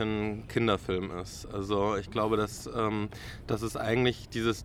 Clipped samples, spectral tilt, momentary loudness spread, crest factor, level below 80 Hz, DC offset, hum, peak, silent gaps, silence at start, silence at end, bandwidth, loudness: under 0.1%; -5.5 dB/octave; 10 LU; 18 dB; -50 dBFS; under 0.1%; none; -12 dBFS; none; 0 s; 0 s; 16.5 kHz; -31 LUFS